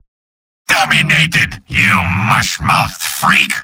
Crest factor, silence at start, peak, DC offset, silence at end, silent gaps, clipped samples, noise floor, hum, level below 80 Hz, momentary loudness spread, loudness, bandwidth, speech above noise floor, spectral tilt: 14 dB; 0.7 s; 0 dBFS; under 0.1%; 0 s; none; under 0.1%; under -90 dBFS; none; -38 dBFS; 5 LU; -12 LUFS; 17 kHz; over 77 dB; -3 dB/octave